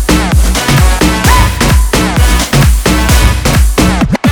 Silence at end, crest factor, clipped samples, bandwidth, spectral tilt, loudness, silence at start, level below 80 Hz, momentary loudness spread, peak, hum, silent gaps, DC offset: 0 s; 8 dB; 0.5%; over 20 kHz; -4.5 dB/octave; -9 LUFS; 0 s; -10 dBFS; 2 LU; 0 dBFS; none; none; under 0.1%